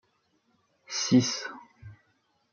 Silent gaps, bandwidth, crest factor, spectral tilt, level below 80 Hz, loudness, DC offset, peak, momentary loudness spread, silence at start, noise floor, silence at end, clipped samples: none; 7.2 kHz; 22 dB; -4 dB/octave; -70 dBFS; -27 LUFS; under 0.1%; -10 dBFS; 18 LU; 0.9 s; -71 dBFS; 0.6 s; under 0.1%